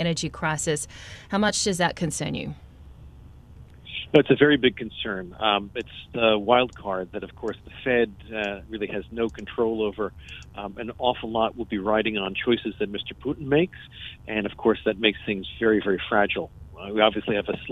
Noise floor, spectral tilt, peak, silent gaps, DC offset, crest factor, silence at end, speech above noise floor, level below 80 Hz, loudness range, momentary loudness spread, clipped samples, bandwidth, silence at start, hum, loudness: -47 dBFS; -4.5 dB/octave; -2 dBFS; none; under 0.1%; 24 dB; 0 s; 21 dB; -50 dBFS; 5 LU; 13 LU; under 0.1%; 13 kHz; 0 s; none; -25 LUFS